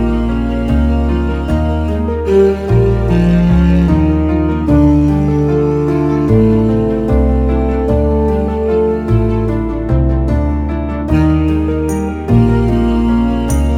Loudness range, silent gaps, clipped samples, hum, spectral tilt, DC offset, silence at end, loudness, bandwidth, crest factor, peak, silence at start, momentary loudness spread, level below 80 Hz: 3 LU; none; under 0.1%; none; -9 dB/octave; under 0.1%; 0 s; -13 LUFS; 14 kHz; 12 dB; 0 dBFS; 0 s; 6 LU; -18 dBFS